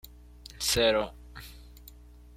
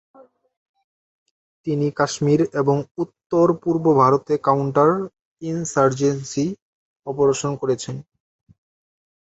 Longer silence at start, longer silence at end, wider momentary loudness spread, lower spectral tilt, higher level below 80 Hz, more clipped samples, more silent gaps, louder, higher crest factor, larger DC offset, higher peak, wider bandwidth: second, 0.55 s vs 1.65 s; second, 0.45 s vs 1.35 s; first, 25 LU vs 15 LU; second, -2.5 dB/octave vs -6.5 dB/octave; first, -48 dBFS vs -60 dBFS; neither; second, none vs 2.91-2.95 s, 3.26-3.30 s, 5.21-5.37 s, 6.62-7.03 s; second, -27 LUFS vs -20 LUFS; about the same, 20 dB vs 18 dB; neither; second, -12 dBFS vs -2 dBFS; first, 16.5 kHz vs 8.2 kHz